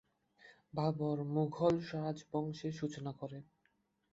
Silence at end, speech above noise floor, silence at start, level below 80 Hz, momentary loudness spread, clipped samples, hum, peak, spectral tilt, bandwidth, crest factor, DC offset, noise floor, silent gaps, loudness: 0.7 s; 41 dB; 0.45 s; -72 dBFS; 12 LU; under 0.1%; none; -18 dBFS; -7.5 dB/octave; 8 kHz; 20 dB; under 0.1%; -79 dBFS; none; -38 LUFS